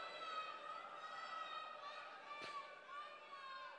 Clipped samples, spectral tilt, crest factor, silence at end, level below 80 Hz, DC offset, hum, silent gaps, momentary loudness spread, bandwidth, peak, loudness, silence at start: under 0.1%; -1.5 dB/octave; 14 dB; 0 s; under -90 dBFS; under 0.1%; none; none; 6 LU; 10 kHz; -38 dBFS; -51 LUFS; 0 s